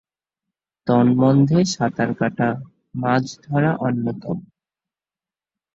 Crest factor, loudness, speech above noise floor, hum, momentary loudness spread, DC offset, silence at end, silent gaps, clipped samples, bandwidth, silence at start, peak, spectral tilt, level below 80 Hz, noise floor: 16 dB; -20 LUFS; over 71 dB; none; 15 LU; under 0.1%; 1.35 s; none; under 0.1%; 8 kHz; 0.85 s; -4 dBFS; -7 dB/octave; -58 dBFS; under -90 dBFS